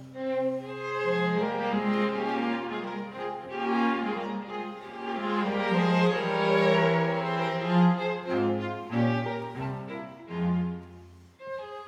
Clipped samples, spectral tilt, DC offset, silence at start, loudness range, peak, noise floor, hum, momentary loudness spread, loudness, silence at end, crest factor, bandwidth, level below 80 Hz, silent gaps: under 0.1%; -7.5 dB/octave; under 0.1%; 0 s; 6 LU; -12 dBFS; -50 dBFS; none; 13 LU; -28 LUFS; 0 s; 16 dB; 8 kHz; -70 dBFS; none